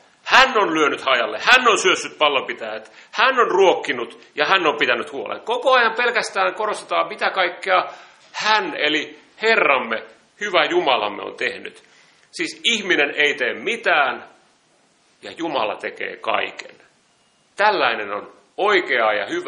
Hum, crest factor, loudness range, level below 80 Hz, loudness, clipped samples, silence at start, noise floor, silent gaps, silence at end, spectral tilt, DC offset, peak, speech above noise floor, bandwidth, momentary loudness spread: none; 20 dB; 6 LU; -62 dBFS; -18 LUFS; under 0.1%; 0.25 s; -60 dBFS; none; 0 s; -2 dB/octave; under 0.1%; 0 dBFS; 40 dB; 10.5 kHz; 14 LU